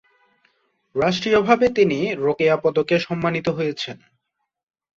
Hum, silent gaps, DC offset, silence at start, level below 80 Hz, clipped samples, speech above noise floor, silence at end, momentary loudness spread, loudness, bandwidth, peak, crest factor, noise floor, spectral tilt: none; none; under 0.1%; 0.95 s; -56 dBFS; under 0.1%; 59 dB; 1 s; 9 LU; -20 LUFS; 7.6 kHz; -4 dBFS; 18 dB; -78 dBFS; -6 dB/octave